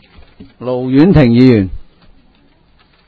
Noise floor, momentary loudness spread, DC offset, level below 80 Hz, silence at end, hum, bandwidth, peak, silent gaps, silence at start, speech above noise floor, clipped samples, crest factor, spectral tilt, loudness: -50 dBFS; 14 LU; under 0.1%; -32 dBFS; 1.25 s; none; 5 kHz; 0 dBFS; none; 0.4 s; 40 dB; 0.6%; 12 dB; -10 dB/octave; -10 LUFS